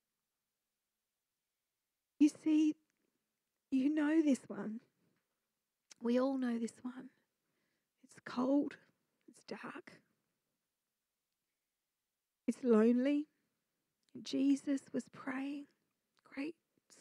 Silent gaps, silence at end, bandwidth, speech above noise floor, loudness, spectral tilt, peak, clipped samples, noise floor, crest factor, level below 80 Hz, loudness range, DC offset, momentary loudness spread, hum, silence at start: none; 0.5 s; 11 kHz; over 55 dB; -36 LUFS; -5.5 dB/octave; -18 dBFS; under 0.1%; under -90 dBFS; 20 dB; under -90 dBFS; 7 LU; under 0.1%; 19 LU; none; 2.2 s